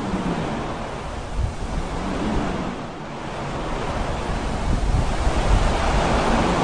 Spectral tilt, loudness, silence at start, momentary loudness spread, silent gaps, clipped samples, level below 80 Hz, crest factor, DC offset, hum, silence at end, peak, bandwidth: -5.5 dB/octave; -25 LUFS; 0 s; 10 LU; none; under 0.1%; -26 dBFS; 16 dB; 0.7%; none; 0 s; -6 dBFS; 10 kHz